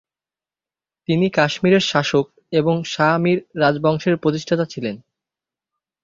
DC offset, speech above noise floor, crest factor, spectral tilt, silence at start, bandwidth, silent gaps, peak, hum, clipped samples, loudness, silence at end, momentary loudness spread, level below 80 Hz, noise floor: under 0.1%; over 72 dB; 18 dB; -6 dB/octave; 1.1 s; 7.6 kHz; none; -2 dBFS; none; under 0.1%; -19 LUFS; 1.05 s; 8 LU; -58 dBFS; under -90 dBFS